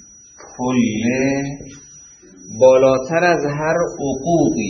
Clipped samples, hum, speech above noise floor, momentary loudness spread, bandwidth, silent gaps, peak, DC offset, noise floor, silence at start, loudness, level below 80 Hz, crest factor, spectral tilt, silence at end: under 0.1%; none; 27 dB; 19 LU; 7.2 kHz; none; 0 dBFS; under 0.1%; -43 dBFS; 0.4 s; -17 LUFS; -48 dBFS; 18 dB; -5.5 dB/octave; 0 s